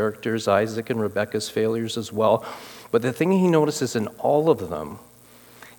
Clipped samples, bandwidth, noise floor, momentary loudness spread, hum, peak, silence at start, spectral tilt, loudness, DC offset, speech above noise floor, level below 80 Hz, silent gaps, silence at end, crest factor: under 0.1%; 18 kHz; -50 dBFS; 12 LU; 60 Hz at -50 dBFS; -4 dBFS; 0 s; -5.5 dB/octave; -23 LUFS; under 0.1%; 27 dB; -64 dBFS; none; 0.1 s; 18 dB